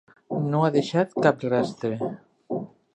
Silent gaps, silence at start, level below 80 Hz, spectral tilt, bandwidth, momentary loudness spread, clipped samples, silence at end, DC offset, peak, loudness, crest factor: none; 0.3 s; -68 dBFS; -7 dB/octave; 9.2 kHz; 11 LU; under 0.1%; 0.3 s; under 0.1%; -4 dBFS; -25 LUFS; 22 dB